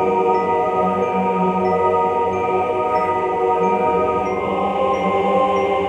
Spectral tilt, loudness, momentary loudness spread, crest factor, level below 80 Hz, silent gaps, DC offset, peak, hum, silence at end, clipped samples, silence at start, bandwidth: -7 dB/octave; -18 LUFS; 2 LU; 12 dB; -50 dBFS; none; under 0.1%; -6 dBFS; none; 0 s; under 0.1%; 0 s; 9.4 kHz